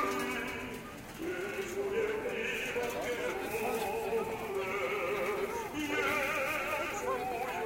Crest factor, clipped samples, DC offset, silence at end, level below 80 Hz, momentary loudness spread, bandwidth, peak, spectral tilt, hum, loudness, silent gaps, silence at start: 16 dB; under 0.1%; under 0.1%; 0 s; -60 dBFS; 6 LU; 16.5 kHz; -20 dBFS; -3.5 dB/octave; none; -35 LUFS; none; 0 s